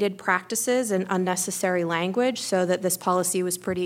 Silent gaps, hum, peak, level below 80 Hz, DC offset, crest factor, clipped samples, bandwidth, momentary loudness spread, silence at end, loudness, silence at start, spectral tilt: none; none; -8 dBFS; -68 dBFS; under 0.1%; 18 dB; under 0.1%; 17 kHz; 2 LU; 0 s; -24 LUFS; 0 s; -4 dB/octave